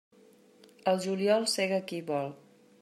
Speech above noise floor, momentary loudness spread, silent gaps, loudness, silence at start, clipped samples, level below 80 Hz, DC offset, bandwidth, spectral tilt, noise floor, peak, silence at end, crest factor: 30 dB; 8 LU; none; -30 LUFS; 0.85 s; under 0.1%; -82 dBFS; under 0.1%; 14 kHz; -4 dB/octave; -60 dBFS; -14 dBFS; 0.45 s; 18 dB